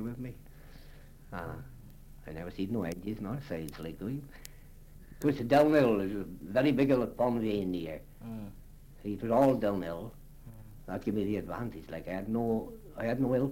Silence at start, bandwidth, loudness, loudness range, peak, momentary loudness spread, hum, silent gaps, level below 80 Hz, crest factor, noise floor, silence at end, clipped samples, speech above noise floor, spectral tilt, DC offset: 0 s; 16.5 kHz; -32 LUFS; 11 LU; -12 dBFS; 21 LU; none; none; -52 dBFS; 20 dB; -51 dBFS; 0 s; under 0.1%; 20 dB; -7.5 dB/octave; under 0.1%